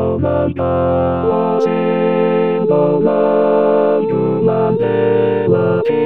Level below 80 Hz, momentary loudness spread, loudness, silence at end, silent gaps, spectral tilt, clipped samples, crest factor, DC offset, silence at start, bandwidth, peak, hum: -42 dBFS; 3 LU; -14 LUFS; 0 s; none; -9.5 dB/octave; under 0.1%; 12 dB; 0.9%; 0 s; 5.8 kHz; -2 dBFS; none